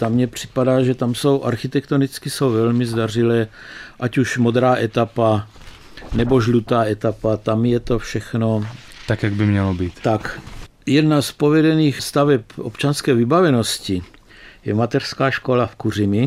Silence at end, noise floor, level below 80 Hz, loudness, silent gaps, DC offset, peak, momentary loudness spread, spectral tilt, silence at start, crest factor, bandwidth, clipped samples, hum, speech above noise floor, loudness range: 0 s; -44 dBFS; -42 dBFS; -19 LUFS; none; under 0.1%; -4 dBFS; 10 LU; -6.5 dB/octave; 0 s; 14 dB; 15.5 kHz; under 0.1%; none; 26 dB; 3 LU